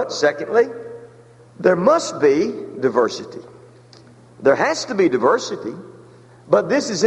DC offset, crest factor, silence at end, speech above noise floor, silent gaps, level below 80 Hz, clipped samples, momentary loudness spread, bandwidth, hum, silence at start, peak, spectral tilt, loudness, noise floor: under 0.1%; 18 dB; 0 s; 28 dB; none; -64 dBFS; under 0.1%; 18 LU; 11 kHz; none; 0 s; -2 dBFS; -4.5 dB/octave; -18 LUFS; -46 dBFS